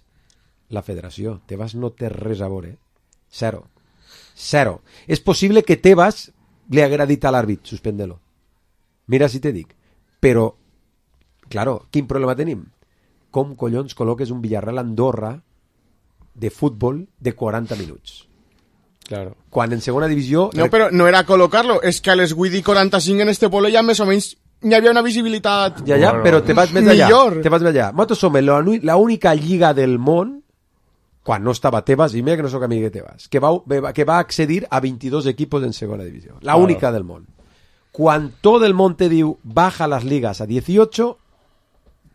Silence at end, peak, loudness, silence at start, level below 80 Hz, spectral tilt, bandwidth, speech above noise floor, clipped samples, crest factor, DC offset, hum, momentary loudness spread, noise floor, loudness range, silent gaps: 1 s; 0 dBFS; -16 LUFS; 0.7 s; -46 dBFS; -6 dB/octave; 14 kHz; 47 dB; under 0.1%; 18 dB; under 0.1%; none; 16 LU; -63 dBFS; 11 LU; none